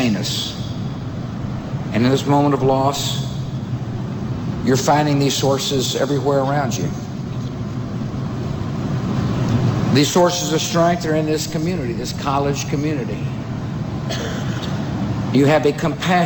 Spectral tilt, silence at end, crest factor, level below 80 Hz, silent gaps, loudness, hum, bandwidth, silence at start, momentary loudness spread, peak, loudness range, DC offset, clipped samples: -5.5 dB/octave; 0 s; 14 dB; -40 dBFS; none; -20 LUFS; none; over 20 kHz; 0 s; 10 LU; -4 dBFS; 4 LU; under 0.1%; under 0.1%